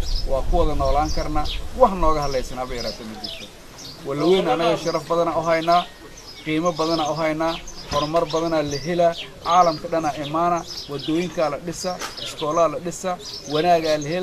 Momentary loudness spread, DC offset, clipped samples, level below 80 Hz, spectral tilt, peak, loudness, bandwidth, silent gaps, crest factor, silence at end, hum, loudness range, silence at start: 12 LU; under 0.1%; under 0.1%; -32 dBFS; -5 dB/octave; -2 dBFS; -22 LUFS; 14 kHz; none; 20 dB; 0 s; none; 3 LU; 0 s